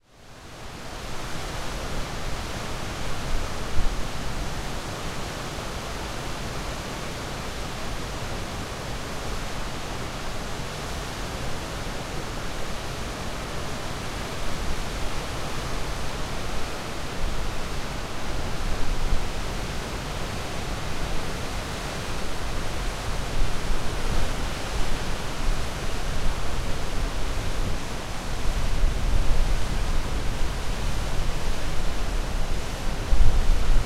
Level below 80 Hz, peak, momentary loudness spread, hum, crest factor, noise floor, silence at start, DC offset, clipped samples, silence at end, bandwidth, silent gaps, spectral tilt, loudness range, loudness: -28 dBFS; -4 dBFS; 4 LU; none; 20 dB; -45 dBFS; 0.2 s; under 0.1%; under 0.1%; 0 s; 14 kHz; none; -4 dB/octave; 3 LU; -31 LUFS